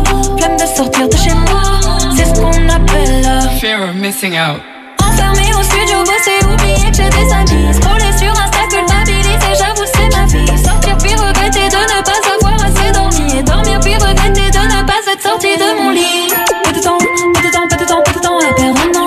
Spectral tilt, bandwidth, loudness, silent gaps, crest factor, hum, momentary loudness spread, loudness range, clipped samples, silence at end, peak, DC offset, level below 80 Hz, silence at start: -3.5 dB/octave; 14 kHz; -11 LUFS; none; 10 dB; none; 2 LU; 2 LU; under 0.1%; 0 s; 0 dBFS; under 0.1%; -14 dBFS; 0 s